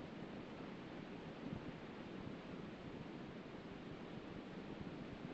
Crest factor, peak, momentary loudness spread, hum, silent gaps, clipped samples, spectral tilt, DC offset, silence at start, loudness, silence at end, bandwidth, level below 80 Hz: 16 dB; -34 dBFS; 2 LU; none; none; under 0.1%; -5.5 dB/octave; under 0.1%; 0 s; -52 LUFS; 0 s; 8 kHz; -70 dBFS